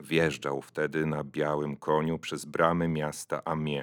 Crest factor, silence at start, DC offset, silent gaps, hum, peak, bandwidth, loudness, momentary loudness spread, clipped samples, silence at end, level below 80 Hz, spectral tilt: 20 dB; 0 s; under 0.1%; none; none; -8 dBFS; 18 kHz; -30 LUFS; 8 LU; under 0.1%; 0 s; -62 dBFS; -5.5 dB/octave